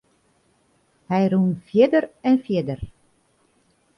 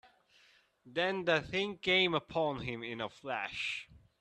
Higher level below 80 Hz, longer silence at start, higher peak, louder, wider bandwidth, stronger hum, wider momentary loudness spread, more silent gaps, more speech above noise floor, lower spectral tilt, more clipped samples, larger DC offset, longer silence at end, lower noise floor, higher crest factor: first, -52 dBFS vs -66 dBFS; first, 1.1 s vs 0.05 s; first, -4 dBFS vs -14 dBFS; first, -21 LUFS vs -34 LUFS; second, 6 kHz vs 10.5 kHz; neither; about the same, 13 LU vs 12 LU; neither; first, 44 dB vs 32 dB; first, -9 dB/octave vs -4.5 dB/octave; neither; neither; first, 1.1 s vs 0.25 s; second, -63 dBFS vs -67 dBFS; about the same, 20 dB vs 22 dB